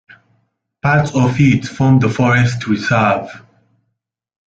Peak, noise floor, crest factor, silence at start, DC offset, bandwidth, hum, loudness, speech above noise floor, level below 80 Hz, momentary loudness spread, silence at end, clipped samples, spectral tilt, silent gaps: -2 dBFS; -73 dBFS; 14 dB; 0.85 s; under 0.1%; 7.8 kHz; none; -14 LUFS; 60 dB; -46 dBFS; 7 LU; 1.1 s; under 0.1%; -7 dB/octave; none